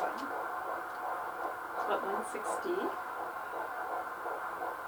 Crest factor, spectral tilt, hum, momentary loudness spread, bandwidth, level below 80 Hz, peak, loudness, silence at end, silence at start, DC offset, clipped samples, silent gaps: 16 dB; -3.5 dB/octave; none; 5 LU; over 20 kHz; -76 dBFS; -20 dBFS; -37 LUFS; 0 s; 0 s; under 0.1%; under 0.1%; none